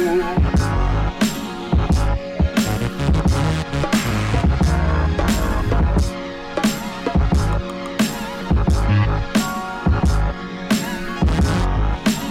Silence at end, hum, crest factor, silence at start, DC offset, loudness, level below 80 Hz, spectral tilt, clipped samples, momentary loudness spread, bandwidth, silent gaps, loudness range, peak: 0 s; none; 14 dB; 0 s; under 0.1%; -20 LUFS; -22 dBFS; -6 dB/octave; under 0.1%; 5 LU; 16.5 kHz; none; 2 LU; -4 dBFS